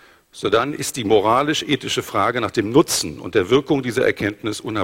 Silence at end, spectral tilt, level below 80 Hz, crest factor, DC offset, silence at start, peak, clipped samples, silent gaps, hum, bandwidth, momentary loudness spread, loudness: 0 s; -4 dB/octave; -52 dBFS; 18 dB; under 0.1%; 0.35 s; -2 dBFS; under 0.1%; none; none; 16.5 kHz; 7 LU; -19 LUFS